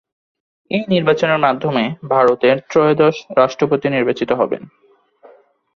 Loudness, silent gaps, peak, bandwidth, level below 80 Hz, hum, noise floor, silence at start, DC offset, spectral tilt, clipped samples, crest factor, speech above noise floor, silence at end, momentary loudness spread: -16 LUFS; none; -2 dBFS; 7 kHz; -58 dBFS; none; -47 dBFS; 0.7 s; under 0.1%; -6.5 dB/octave; under 0.1%; 16 dB; 32 dB; 1.1 s; 7 LU